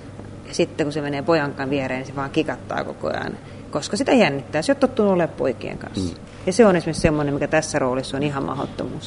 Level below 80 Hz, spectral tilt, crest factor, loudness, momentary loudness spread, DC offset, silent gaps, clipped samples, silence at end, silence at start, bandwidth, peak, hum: -44 dBFS; -5.5 dB/octave; 20 dB; -22 LUFS; 12 LU; under 0.1%; none; under 0.1%; 0 s; 0 s; 11 kHz; -2 dBFS; none